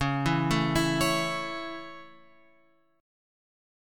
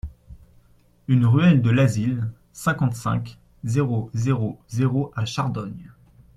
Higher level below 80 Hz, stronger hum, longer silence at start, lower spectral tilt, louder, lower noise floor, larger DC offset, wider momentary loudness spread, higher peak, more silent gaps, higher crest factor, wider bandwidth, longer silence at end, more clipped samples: about the same, -50 dBFS vs -48 dBFS; neither; about the same, 0 s vs 0.05 s; second, -5 dB/octave vs -7 dB/octave; second, -27 LUFS vs -22 LUFS; first, -66 dBFS vs -56 dBFS; neither; about the same, 16 LU vs 18 LU; second, -10 dBFS vs -6 dBFS; neither; about the same, 20 dB vs 18 dB; first, 17.5 kHz vs 13.5 kHz; first, 1.9 s vs 0.45 s; neither